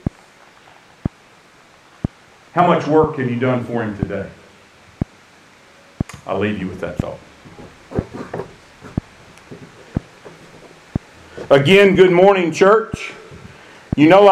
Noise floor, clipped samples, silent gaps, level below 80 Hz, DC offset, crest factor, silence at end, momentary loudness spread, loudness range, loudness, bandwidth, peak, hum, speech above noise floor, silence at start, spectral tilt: -48 dBFS; under 0.1%; none; -42 dBFS; under 0.1%; 18 dB; 0 s; 20 LU; 16 LU; -17 LUFS; 12 kHz; 0 dBFS; none; 34 dB; 2.55 s; -6.5 dB/octave